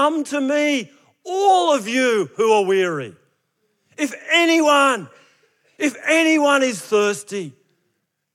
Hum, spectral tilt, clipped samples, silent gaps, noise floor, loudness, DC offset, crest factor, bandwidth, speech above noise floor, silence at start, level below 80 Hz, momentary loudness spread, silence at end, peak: none; -3 dB/octave; under 0.1%; none; -72 dBFS; -18 LUFS; under 0.1%; 18 dB; 15.5 kHz; 54 dB; 0 s; -86 dBFS; 13 LU; 0.85 s; -2 dBFS